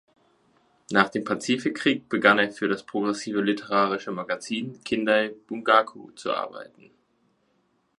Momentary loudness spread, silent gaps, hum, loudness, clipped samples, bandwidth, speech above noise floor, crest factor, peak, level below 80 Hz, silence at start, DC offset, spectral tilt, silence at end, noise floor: 10 LU; none; none; -25 LUFS; under 0.1%; 11.5 kHz; 44 dB; 24 dB; -2 dBFS; -72 dBFS; 0.9 s; under 0.1%; -4.5 dB/octave; 1.35 s; -69 dBFS